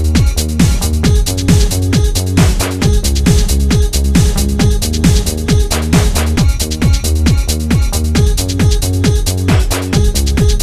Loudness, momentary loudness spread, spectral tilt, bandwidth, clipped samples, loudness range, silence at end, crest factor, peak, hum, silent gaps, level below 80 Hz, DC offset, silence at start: -13 LUFS; 2 LU; -5 dB/octave; 16 kHz; under 0.1%; 1 LU; 0 s; 10 dB; 0 dBFS; none; none; -14 dBFS; under 0.1%; 0 s